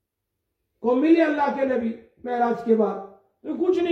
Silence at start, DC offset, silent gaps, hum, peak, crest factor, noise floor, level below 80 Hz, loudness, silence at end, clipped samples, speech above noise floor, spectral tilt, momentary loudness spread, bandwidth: 0.8 s; under 0.1%; none; none; -8 dBFS; 16 dB; -80 dBFS; -68 dBFS; -22 LUFS; 0 s; under 0.1%; 59 dB; -7.5 dB/octave; 16 LU; 6.4 kHz